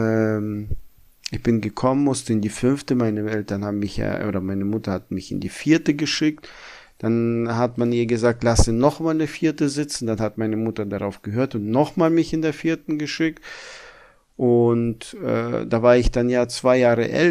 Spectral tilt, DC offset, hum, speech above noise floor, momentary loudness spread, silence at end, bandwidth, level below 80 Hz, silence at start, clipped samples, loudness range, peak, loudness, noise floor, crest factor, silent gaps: -6 dB/octave; under 0.1%; none; 30 dB; 11 LU; 0 s; 14.5 kHz; -36 dBFS; 0 s; under 0.1%; 3 LU; -2 dBFS; -21 LUFS; -50 dBFS; 18 dB; none